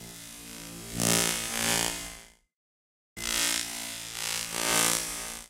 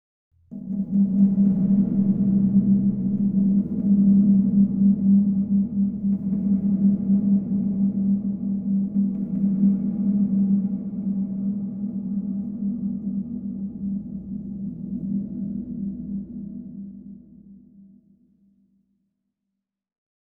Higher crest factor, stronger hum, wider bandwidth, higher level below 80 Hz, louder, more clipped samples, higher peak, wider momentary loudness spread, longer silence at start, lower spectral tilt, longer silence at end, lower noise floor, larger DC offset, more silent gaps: first, 28 dB vs 14 dB; neither; first, 17 kHz vs 1.2 kHz; about the same, -54 dBFS vs -54 dBFS; second, -27 LUFS vs -22 LUFS; neither; first, -4 dBFS vs -8 dBFS; first, 18 LU vs 14 LU; second, 0 s vs 0.5 s; second, -1 dB/octave vs -15 dB/octave; second, 0 s vs 2.7 s; first, under -90 dBFS vs -83 dBFS; neither; first, 2.56-3.16 s vs none